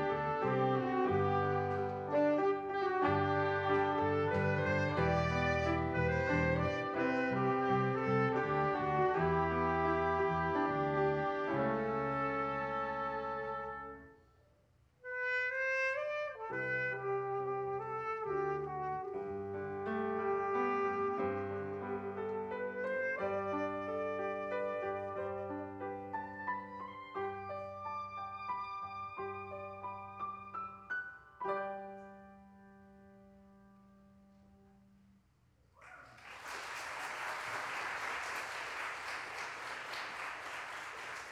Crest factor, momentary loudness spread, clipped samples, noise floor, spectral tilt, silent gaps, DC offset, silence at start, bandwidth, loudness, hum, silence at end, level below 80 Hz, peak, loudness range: 18 dB; 11 LU; under 0.1%; -70 dBFS; -6.5 dB/octave; none; under 0.1%; 0 s; 13 kHz; -36 LUFS; none; 0 s; -60 dBFS; -20 dBFS; 11 LU